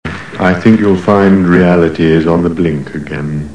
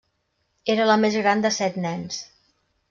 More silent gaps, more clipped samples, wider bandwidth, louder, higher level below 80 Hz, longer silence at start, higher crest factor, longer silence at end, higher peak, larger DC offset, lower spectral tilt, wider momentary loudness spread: neither; first, 0.7% vs under 0.1%; first, 10 kHz vs 7.6 kHz; first, -10 LUFS vs -22 LUFS; first, -36 dBFS vs -68 dBFS; second, 0.05 s vs 0.65 s; second, 10 dB vs 18 dB; second, 0 s vs 0.65 s; first, 0 dBFS vs -6 dBFS; first, 1% vs under 0.1%; first, -8 dB/octave vs -4 dB/octave; about the same, 12 LU vs 13 LU